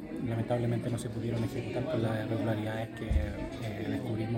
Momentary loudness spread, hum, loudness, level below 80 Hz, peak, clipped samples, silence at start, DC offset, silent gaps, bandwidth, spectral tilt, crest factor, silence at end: 6 LU; none; -34 LUFS; -42 dBFS; -18 dBFS; under 0.1%; 0 s; under 0.1%; none; 16 kHz; -7.5 dB/octave; 16 dB; 0 s